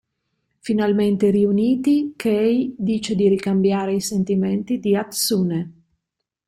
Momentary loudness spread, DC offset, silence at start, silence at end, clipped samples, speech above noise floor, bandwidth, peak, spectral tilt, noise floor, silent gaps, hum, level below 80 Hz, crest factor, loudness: 6 LU; under 0.1%; 0.65 s; 0.75 s; under 0.1%; 62 dB; 16 kHz; -6 dBFS; -6 dB/octave; -81 dBFS; none; none; -58 dBFS; 14 dB; -20 LUFS